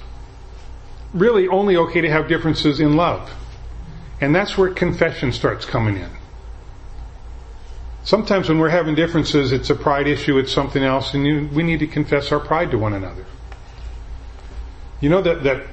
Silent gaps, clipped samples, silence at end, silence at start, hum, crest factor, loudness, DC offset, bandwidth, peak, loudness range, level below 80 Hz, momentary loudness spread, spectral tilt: none; under 0.1%; 0 s; 0 s; none; 18 dB; -18 LUFS; under 0.1%; 8.6 kHz; 0 dBFS; 5 LU; -34 dBFS; 22 LU; -6.5 dB/octave